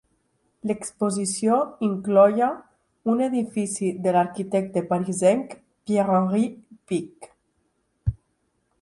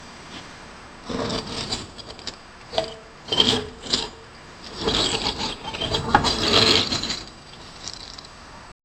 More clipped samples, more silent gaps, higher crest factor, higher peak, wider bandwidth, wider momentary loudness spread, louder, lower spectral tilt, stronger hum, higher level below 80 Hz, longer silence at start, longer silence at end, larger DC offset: neither; neither; second, 20 dB vs 26 dB; second, -4 dBFS vs 0 dBFS; second, 11.5 kHz vs 18.5 kHz; second, 11 LU vs 23 LU; about the same, -23 LUFS vs -22 LUFS; first, -6 dB/octave vs -3 dB/octave; neither; second, -50 dBFS vs -44 dBFS; first, 0.65 s vs 0 s; first, 0.65 s vs 0.25 s; neither